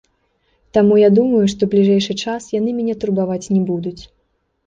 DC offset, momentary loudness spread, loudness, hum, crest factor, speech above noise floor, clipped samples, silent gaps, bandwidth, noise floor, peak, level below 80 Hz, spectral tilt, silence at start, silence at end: under 0.1%; 10 LU; -16 LUFS; none; 14 dB; 51 dB; under 0.1%; none; 7.8 kHz; -66 dBFS; -2 dBFS; -52 dBFS; -6.5 dB/octave; 0.75 s; 0.6 s